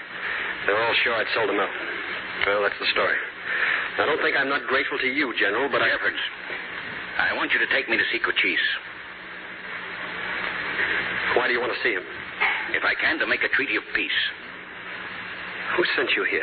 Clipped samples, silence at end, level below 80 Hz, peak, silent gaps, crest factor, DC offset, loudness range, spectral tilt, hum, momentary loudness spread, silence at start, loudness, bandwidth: under 0.1%; 0 s; -60 dBFS; -6 dBFS; none; 18 dB; under 0.1%; 3 LU; -7.5 dB/octave; none; 12 LU; 0 s; -23 LUFS; 5 kHz